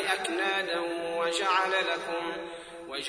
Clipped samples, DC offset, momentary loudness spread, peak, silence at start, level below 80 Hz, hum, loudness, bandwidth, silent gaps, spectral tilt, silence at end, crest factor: under 0.1%; under 0.1%; 13 LU; -12 dBFS; 0 s; -68 dBFS; none; -29 LUFS; 11 kHz; none; -2 dB/octave; 0 s; 18 dB